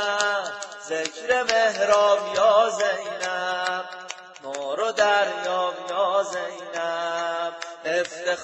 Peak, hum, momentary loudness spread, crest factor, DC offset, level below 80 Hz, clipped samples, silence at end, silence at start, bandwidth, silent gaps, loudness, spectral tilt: -6 dBFS; none; 13 LU; 18 dB; under 0.1%; -68 dBFS; under 0.1%; 0 s; 0 s; 8.8 kHz; none; -23 LUFS; -1 dB/octave